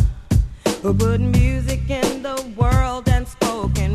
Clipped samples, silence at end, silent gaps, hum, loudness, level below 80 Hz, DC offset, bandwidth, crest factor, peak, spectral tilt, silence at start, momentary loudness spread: under 0.1%; 0 s; none; none; -20 LUFS; -24 dBFS; under 0.1%; 14 kHz; 16 dB; -2 dBFS; -6 dB/octave; 0 s; 6 LU